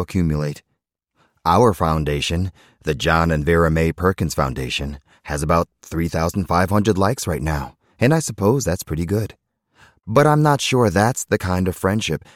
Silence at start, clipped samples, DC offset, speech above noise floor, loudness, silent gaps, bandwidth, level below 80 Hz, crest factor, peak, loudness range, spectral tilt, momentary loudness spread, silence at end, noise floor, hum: 0 s; under 0.1%; under 0.1%; 54 dB; -19 LUFS; none; 16.5 kHz; -36 dBFS; 16 dB; -2 dBFS; 2 LU; -5.5 dB/octave; 10 LU; 0.15 s; -73 dBFS; none